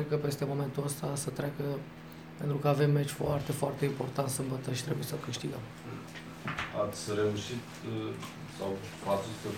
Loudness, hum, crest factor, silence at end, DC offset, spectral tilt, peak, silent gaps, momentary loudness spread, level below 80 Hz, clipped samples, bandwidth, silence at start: -34 LUFS; none; 20 dB; 0 s; under 0.1%; -5.5 dB/octave; -14 dBFS; none; 12 LU; -60 dBFS; under 0.1%; 17 kHz; 0 s